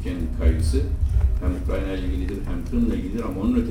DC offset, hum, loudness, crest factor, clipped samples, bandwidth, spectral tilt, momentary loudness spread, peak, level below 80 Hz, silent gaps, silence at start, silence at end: under 0.1%; none; -25 LUFS; 14 dB; under 0.1%; 11 kHz; -8 dB/octave; 6 LU; -8 dBFS; -24 dBFS; none; 0 s; 0 s